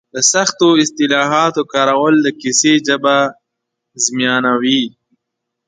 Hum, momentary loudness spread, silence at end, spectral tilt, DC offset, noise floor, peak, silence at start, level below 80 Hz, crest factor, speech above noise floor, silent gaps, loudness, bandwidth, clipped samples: none; 5 LU; 0.8 s; -2.5 dB/octave; under 0.1%; -77 dBFS; 0 dBFS; 0.15 s; -64 dBFS; 14 dB; 64 dB; none; -13 LUFS; 9.6 kHz; under 0.1%